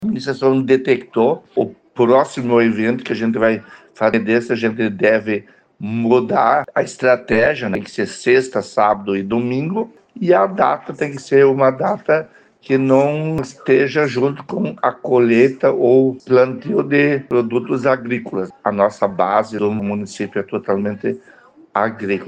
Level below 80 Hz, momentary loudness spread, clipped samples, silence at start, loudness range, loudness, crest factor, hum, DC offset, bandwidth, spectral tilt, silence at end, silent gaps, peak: -58 dBFS; 10 LU; under 0.1%; 0 s; 3 LU; -17 LUFS; 16 dB; none; under 0.1%; 9.2 kHz; -7 dB/octave; 0 s; none; 0 dBFS